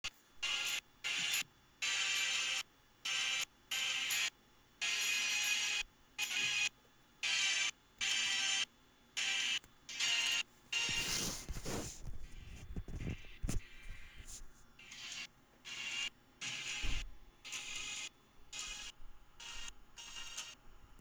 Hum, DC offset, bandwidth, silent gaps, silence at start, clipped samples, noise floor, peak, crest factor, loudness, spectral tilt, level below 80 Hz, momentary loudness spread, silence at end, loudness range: none; under 0.1%; over 20 kHz; none; 0.05 s; under 0.1%; -67 dBFS; -22 dBFS; 18 dB; -37 LUFS; 0 dB/octave; -54 dBFS; 18 LU; 0 s; 12 LU